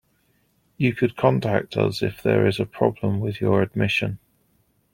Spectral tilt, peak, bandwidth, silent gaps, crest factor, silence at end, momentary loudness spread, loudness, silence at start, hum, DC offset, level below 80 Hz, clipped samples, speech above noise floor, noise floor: -7.5 dB/octave; -2 dBFS; 16.5 kHz; none; 20 dB; 0.75 s; 5 LU; -22 LUFS; 0.8 s; none; under 0.1%; -56 dBFS; under 0.1%; 44 dB; -65 dBFS